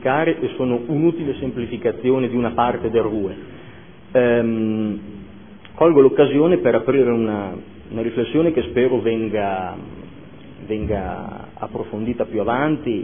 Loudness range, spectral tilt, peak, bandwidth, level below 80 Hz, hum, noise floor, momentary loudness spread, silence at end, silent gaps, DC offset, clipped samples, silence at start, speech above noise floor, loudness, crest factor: 7 LU; -11.5 dB/octave; -2 dBFS; 3.6 kHz; -46 dBFS; none; -42 dBFS; 17 LU; 0 s; none; 0.5%; under 0.1%; 0 s; 23 dB; -19 LUFS; 18 dB